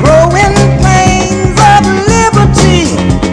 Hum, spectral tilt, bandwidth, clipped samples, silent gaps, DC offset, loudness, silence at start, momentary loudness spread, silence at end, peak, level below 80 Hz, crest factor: none; -5 dB/octave; 11 kHz; 7%; none; under 0.1%; -7 LUFS; 0 s; 5 LU; 0 s; 0 dBFS; -18 dBFS; 6 dB